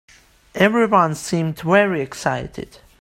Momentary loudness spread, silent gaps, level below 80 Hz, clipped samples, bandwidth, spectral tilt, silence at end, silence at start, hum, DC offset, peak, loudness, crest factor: 19 LU; none; -50 dBFS; under 0.1%; 16 kHz; -5.5 dB/octave; 0.4 s; 0.55 s; none; under 0.1%; 0 dBFS; -18 LUFS; 20 dB